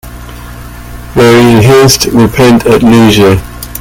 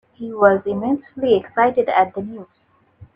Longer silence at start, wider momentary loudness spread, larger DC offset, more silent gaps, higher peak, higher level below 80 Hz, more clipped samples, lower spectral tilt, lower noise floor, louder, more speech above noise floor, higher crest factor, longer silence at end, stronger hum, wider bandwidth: second, 0.05 s vs 0.2 s; first, 22 LU vs 15 LU; neither; neither; about the same, 0 dBFS vs 0 dBFS; first, -26 dBFS vs -58 dBFS; first, 3% vs under 0.1%; second, -5 dB/octave vs -8.5 dB/octave; second, -24 dBFS vs -48 dBFS; first, -5 LUFS vs -18 LUFS; second, 20 dB vs 29 dB; second, 6 dB vs 18 dB; about the same, 0 s vs 0.1 s; first, 60 Hz at -20 dBFS vs none; first, 18.5 kHz vs 5.2 kHz